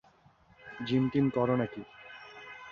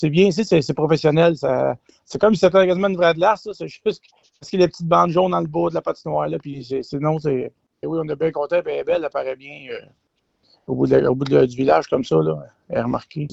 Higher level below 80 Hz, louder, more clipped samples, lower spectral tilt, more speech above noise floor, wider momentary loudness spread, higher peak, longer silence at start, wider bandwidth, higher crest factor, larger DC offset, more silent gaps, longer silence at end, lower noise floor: second, -64 dBFS vs -54 dBFS; second, -30 LUFS vs -19 LUFS; neither; first, -8.5 dB/octave vs -7 dB/octave; second, 33 dB vs 45 dB; first, 20 LU vs 13 LU; second, -14 dBFS vs -4 dBFS; first, 0.65 s vs 0 s; second, 6.8 kHz vs 8.2 kHz; about the same, 18 dB vs 16 dB; neither; neither; about the same, 0 s vs 0 s; about the same, -62 dBFS vs -64 dBFS